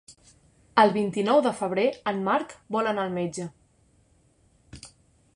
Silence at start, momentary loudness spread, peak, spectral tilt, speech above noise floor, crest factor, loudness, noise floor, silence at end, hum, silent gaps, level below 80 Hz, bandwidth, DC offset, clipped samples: 0.1 s; 18 LU; -4 dBFS; -5.5 dB/octave; 38 dB; 22 dB; -25 LUFS; -63 dBFS; 0.5 s; none; none; -64 dBFS; 11.5 kHz; under 0.1%; under 0.1%